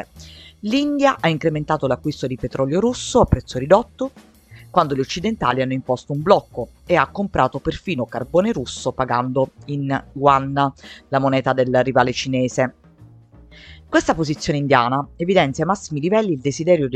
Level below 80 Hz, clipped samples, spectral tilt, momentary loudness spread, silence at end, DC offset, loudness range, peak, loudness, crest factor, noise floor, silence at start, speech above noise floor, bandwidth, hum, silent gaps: -42 dBFS; under 0.1%; -6 dB/octave; 8 LU; 0 s; under 0.1%; 2 LU; 0 dBFS; -20 LUFS; 20 dB; -46 dBFS; 0 s; 27 dB; 12 kHz; none; none